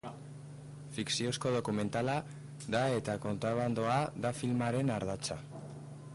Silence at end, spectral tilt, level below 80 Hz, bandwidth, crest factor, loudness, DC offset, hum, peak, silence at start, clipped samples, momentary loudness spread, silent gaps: 0 s; -5.5 dB/octave; -64 dBFS; 11.5 kHz; 14 dB; -34 LUFS; under 0.1%; none; -22 dBFS; 0.05 s; under 0.1%; 16 LU; none